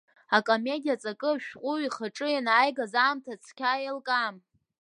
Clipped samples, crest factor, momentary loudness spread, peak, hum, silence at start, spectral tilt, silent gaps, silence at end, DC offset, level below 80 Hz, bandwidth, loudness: under 0.1%; 20 dB; 9 LU; -8 dBFS; none; 0.3 s; -3.5 dB/octave; none; 0.45 s; under 0.1%; -84 dBFS; 11 kHz; -28 LUFS